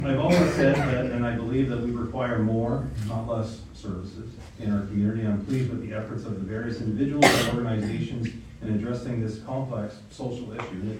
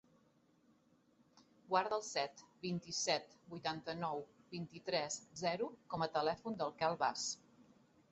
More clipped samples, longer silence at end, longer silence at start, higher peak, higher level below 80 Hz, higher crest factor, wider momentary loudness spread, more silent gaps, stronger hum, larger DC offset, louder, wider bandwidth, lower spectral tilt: neither; second, 0 s vs 0.5 s; second, 0 s vs 1.7 s; first, -2 dBFS vs -18 dBFS; first, -46 dBFS vs -78 dBFS; about the same, 24 dB vs 24 dB; first, 14 LU vs 10 LU; neither; neither; neither; first, -27 LUFS vs -40 LUFS; first, 16 kHz vs 8 kHz; first, -6 dB/octave vs -2.5 dB/octave